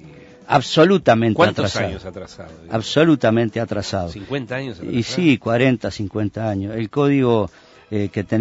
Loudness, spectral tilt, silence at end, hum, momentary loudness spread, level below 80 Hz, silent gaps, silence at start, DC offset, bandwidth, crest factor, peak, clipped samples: -19 LUFS; -6 dB/octave; 0 s; none; 13 LU; -48 dBFS; none; 0.05 s; under 0.1%; 8 kHz; 18 dB; -2 dBFS; under 0.1%